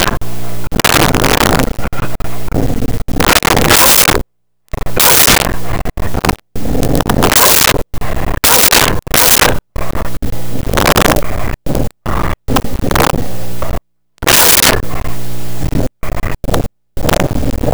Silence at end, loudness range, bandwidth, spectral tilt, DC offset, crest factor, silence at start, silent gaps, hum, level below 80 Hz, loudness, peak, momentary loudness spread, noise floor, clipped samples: 0 s; 6 LU; over 20 kHz; -3 dB/octave; 10%; 12 dB; 0 s; none; none; -22 dBFS; -10 LUFS; 0 dBFS; 17 LU; -57 dBFS; under 0.1%